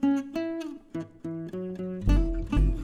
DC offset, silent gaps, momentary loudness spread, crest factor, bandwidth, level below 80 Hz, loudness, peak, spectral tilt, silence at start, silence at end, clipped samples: under 0.1%; none; 11 LU; 16 dB; 7.2 kHz; -30 dBFS; -31 LUFS; -12 dBFS; -8 dB/octave; 0 s; 0 s; under 0.1%